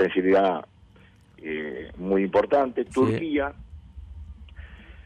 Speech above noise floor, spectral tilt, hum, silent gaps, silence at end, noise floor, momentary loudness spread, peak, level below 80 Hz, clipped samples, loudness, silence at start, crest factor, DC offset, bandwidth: 30 dB; -7.5 dB/octave; none; none; 0.05 s; -54 dBFS; 24 LU; -10 dBFS; -48 dBFS; under 0.1%; -24 LUFS; 0 s; 16 dB; under 0.1%; 10 kHz